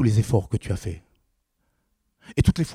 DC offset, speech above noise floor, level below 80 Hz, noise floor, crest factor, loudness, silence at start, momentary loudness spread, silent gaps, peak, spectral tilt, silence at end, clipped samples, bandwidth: under 0.1%; 50 dB; -40 dBFS; -72 dBFS; 20 dB; -24 LUFS; 0 s; 13 LU; none; -4 dBFS; -7 dB/octave; 0 s; under 0.1%; 14 kHz